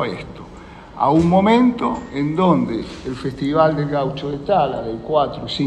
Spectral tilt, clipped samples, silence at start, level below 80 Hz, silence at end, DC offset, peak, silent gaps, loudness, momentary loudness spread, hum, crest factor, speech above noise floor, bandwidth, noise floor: -7.5 dB/octave; under 0.1%; 0 s; -44 dBFS; 0 s; under 0.1%; -2 dBFS; none; -18 LUFS; 17 LU; none; 16 dB; 20 dB; 9.6 kHz; -38 dBFS